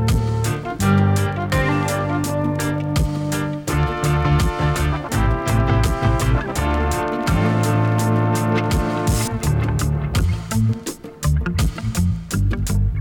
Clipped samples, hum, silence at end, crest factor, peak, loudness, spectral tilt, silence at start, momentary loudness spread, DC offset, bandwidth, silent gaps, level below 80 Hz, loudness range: under 0.1%; none; 0 s; 14 dB; -4 dBFS; -20 LUFS; -6 dB/octave; 0 s; 4 LU; under 0.1%; 19 kHz; none; -26 dBFS; 2 LU